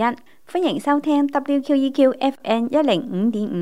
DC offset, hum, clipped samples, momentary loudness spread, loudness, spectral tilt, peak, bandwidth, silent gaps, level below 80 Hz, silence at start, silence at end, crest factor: 0.5%; none; under 0.1%; 5 LU; -20 LUFS; -6.5 dB/octave; -4 dBFS; 12 kHz; none; -72 dBFS; 0 s; 0 s; 16 dB